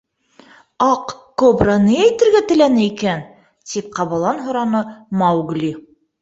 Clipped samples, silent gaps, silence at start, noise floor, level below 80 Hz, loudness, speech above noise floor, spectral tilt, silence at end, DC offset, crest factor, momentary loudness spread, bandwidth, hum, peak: under 0.1%; none; 0.8 s; -49 dBFS; -46 dBFS; -16 LUFS; 33 dB; -6 dB/octave; 0.4 s; under 0.1%; 16 dB; 12 LU; 7.8 kHz; none; -2 dBFS